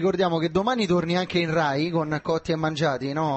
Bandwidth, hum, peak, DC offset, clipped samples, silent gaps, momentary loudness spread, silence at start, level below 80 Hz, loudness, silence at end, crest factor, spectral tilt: 8.4 kHz; none; -10 dBFS; under 0.1%; under 0.1%; none; 4 LU; 0 s; -54 dBFS; -24 LUFS; 0 s; 14 dB; -6 dB/octave